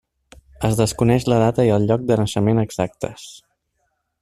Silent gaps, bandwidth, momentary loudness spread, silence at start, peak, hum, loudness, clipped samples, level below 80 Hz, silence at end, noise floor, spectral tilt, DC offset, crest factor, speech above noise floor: none; 14 kHz; 14 LU; 0.6 s; -2 dBFS; none; -19 LUFS; under 0.1%; -44 dBFS; 0.9 s; -71 dBFS; -6.5 dB/octave; under 0.1%; 18 dB; 53 dB